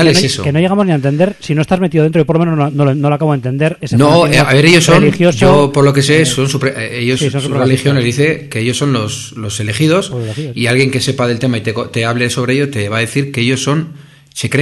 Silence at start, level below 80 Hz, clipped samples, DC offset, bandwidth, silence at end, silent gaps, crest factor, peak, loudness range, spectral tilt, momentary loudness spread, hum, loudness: 0 s; -40 dBFS; 0.2%; under 0.1%; 12.5 kHz; 0 s; none; 12 dB; 0 dBFS; 6 LU; -5.5 dB/octave; 9 LU; none; -12 LUFS